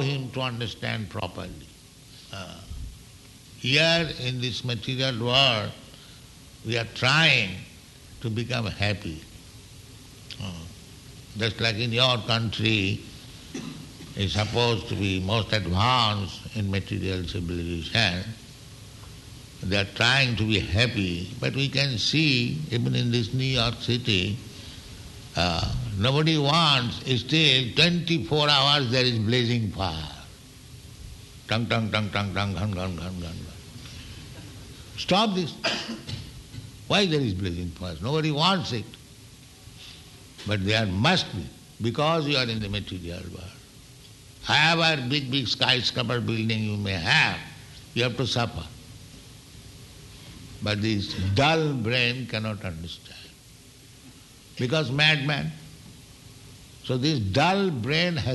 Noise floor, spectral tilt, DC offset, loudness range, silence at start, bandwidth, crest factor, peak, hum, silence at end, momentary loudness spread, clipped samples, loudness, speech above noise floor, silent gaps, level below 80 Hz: -50 dBFS; -5 dB/octave; under 0.1%; 7 LU; 0 s; 12 kHz; 22 dB; -4 dBFS; none; 0 s; 23 LU; under 0.1%; -24 LUFS; 25 dB; none; -48 dBFS